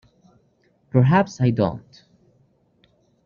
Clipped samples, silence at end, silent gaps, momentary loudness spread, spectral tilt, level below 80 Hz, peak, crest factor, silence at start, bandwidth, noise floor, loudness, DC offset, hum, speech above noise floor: under 0.1%; 1.45 s; none; 8 LU; -7.5 dB/octave; -56 dBFS; -4 dBFS; 20 dB; 0.95 s; 7.2 kHz; -63 dBFS; -20 LUFS; under 0.1%; none; 44 dB